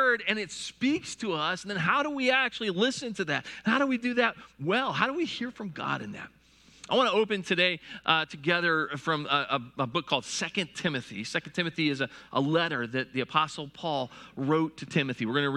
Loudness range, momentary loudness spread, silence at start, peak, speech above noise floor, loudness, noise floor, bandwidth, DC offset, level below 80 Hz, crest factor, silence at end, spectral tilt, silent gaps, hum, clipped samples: 3 LU; 8 LU; 0 s; -6 dBFS; 25 dB; -28 LUFS; -54 dBFS; 12 kHz; under 0.1%; -68 dBFS; 22 dB; 0 s; -4.5 dB/octave; none; none; under 0.1%